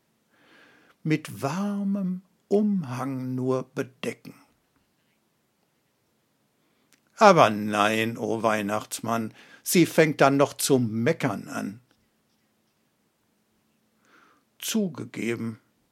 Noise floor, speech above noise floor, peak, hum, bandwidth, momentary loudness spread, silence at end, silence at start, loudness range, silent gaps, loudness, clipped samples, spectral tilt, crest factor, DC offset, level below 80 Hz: -71 dBFS; 46 dB; 0 dBFS; none; 16.5 kHz; 15 LU; 0.35 s; 1.05 s; 13 LU; none; -25 LUFS; under 0.1%; -5 dB/octave; 26 dB; under 0.1%; -76 dBFS